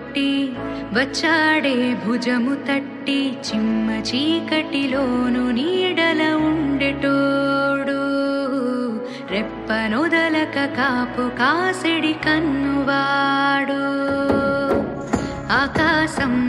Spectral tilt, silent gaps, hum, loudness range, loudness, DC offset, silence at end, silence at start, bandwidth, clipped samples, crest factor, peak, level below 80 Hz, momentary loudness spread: -5 dB/octave; none; none; 2 LU; -20 LUFS; under 0.1%; 0 s; 0 s; 11.5 kHz; under 0.1%; 16 dB; -4 dBFS; -46 dBFS; 6 LU